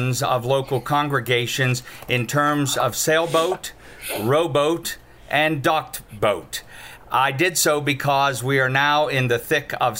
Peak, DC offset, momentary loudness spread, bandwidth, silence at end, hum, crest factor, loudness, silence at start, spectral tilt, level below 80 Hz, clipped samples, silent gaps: -4 dBFS; under 0.1%; 11 LU; 16.5 kHz; 0 s; none; 16 dB; -20 LUFS; 0 s; -4 dB/octave; -52 dBFS; under 0.1%; none